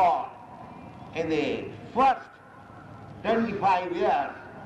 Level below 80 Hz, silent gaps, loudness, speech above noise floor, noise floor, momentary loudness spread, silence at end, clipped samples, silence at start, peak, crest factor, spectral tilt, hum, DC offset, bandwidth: -60 dBFS; none; -27 LUFS; 22 dB; -48 dBFS; 21 LU; 0 s; under 0.1%; 0 s; -14 dBFS; 14 dB; -6 dB/octave; none; under 0.1%; 9.2 kHz